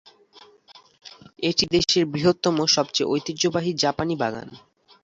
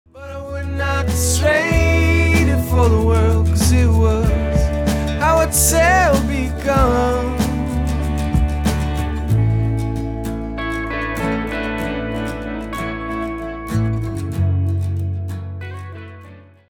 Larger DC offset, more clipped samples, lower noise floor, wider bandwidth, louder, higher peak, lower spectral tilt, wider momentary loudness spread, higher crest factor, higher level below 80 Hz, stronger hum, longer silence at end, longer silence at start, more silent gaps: neither; neither; first, -52 dBFS vs -41 dBFS; second, 8 kHz vs 18 kHz; second, -22 LUFS vs -18 LUFS; about the same, -4 dBFS vs -2 dBFS; second, -4 dB/octave vs -5.5 dB/octave; second, 8 LU vs 12 LU; about the same, 20 dB vs 16 dB; second, -54 dBFS vs -24 dBFS; neither; about the same, 0.45 s vs 0.35 s; first, 0.35 s vs 0.15 s; neither